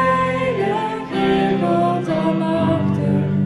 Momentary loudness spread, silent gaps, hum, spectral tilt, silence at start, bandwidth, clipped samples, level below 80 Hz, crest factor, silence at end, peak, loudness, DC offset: 3 LU; none; none; -8 dB/octave; 0 s; 11 kHz; under 0.1%; -48 dBFS; 14 dB; 0 s; -4 dBFS; -19 LUFS; under 0.1%